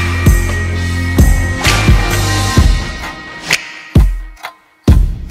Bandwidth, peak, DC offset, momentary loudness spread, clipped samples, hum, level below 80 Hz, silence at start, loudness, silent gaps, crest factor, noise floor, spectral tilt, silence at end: 16 kHz; 0 dBFS; under 0.1%; 13 LU; 0.1%; none; -16 dBFS; 0 s; -13 LUFS; none; 12 dB; -33 dBFS; -4.5 dB/octave; 0 s